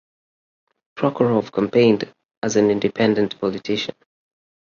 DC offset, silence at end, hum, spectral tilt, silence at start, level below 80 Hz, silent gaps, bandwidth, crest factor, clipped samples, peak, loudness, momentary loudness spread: under 0.1%; 0.75 s; none; -5.5 dB/octave; 0.95 s; -60 dBFS; 2.25-2.29 s, 2.37-2.42 s; 7.4 kHz; 18 dB; under 0.1%; -4 dBFS; -20 LUFS; 9 LU